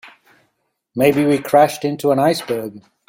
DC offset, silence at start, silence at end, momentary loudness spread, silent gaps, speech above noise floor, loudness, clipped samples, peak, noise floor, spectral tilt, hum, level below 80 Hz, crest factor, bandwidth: under 0.1%; 0.05 s; 0.3 s; 11 LU; none; 53 dB; -16 LUFS; under 0.1%; -2 dBFS; -69 dBFS; -5.5 dB/octave; none; -58 dBFS; 16 dB; 16.5 kHz